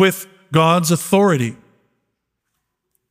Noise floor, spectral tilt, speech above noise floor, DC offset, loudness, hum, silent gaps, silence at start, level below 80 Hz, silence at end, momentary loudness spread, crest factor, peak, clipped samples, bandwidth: -75 dBFS; -5 dB/octave; 60 dB; under 0.1%; -16 LUFS; none; none; 0 s; -62 dBFS; 1.55 s; 9 LU; 18 dB; -2 dBFS; under 0.1%; 16 kHz